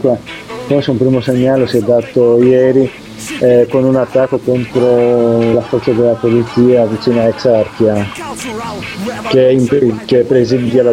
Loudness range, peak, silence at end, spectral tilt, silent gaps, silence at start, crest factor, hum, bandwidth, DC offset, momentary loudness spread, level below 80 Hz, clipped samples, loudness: 2 LU; 0 dBFS; 0 s; -7 dB/octave; none; 0 s; 12 dB; none; 15 kHz; under 0.1%; 12 LU; -46 dBFS; under 0.1%; -12 LUFS